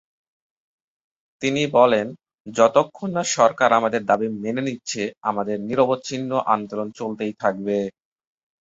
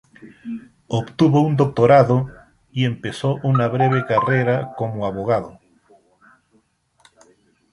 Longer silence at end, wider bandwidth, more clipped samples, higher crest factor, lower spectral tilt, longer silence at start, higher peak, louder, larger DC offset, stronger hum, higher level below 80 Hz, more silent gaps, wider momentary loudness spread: second, 0.75 s vs 2.2 s; second, 8 kHz vs 11 kHz; neither; about the same, 20 dB vs 18 dB; second, -4.5 dB/octave vs -8 dB/octave; first, 1.4 s vs 0.25 s; about the same, -2 dBFS vs -2 dBFS; about the same, -21 LUFS vs -19 LUFS; neither; neither; second, -64 dBFS vs -54 dBFS; first, 2.34-2.45 s vs none; second, 11 LU vs 19 LU